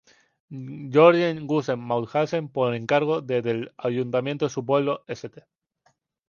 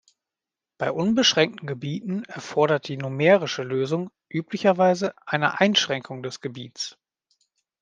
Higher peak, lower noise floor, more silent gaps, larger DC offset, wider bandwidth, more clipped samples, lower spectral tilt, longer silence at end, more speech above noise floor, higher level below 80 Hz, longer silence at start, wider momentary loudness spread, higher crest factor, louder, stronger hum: about the same, -4 dBFS vs -2 dBFS; second, -68 dBFS vs -89 dBFS; neither; neither; second, 7 kHz vs 9.6 kHz; neither; first, -6.5 dB/octave vs -4.5 dB/octave; about the same, 1 s vs 0.9 s; second, 45 dB vs 66 dB; about the same, -70 dBFS vs -70 dBFS; second, 0.5 s vs 0.8 s; first, 19 LU vs 14 LU; about the same, 20 dB vs 22 dB; about the same, -23 LUFS vs -23 LUFS; neither